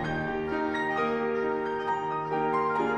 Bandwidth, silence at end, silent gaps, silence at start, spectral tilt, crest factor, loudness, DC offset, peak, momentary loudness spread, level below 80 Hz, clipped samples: 8.4 kHz; 0 s; none; 0 s; -6.5 dB/octave; 12 dB; -29 LUFS; under 0.1%; -16 dBFS; 3 LU; -54 dBFS; under 0.1%